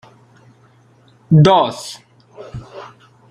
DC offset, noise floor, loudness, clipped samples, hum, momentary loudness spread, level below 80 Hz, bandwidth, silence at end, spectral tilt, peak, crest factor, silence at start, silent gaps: under 0.1%; -51 dBFS; -13 LUFS; under 0.1%; none; 26 LU; -50 dBFS; 11 kHz; 0.45 s; -7 dB/octave; -2 dBFS; 16 dB; 1.3 s; none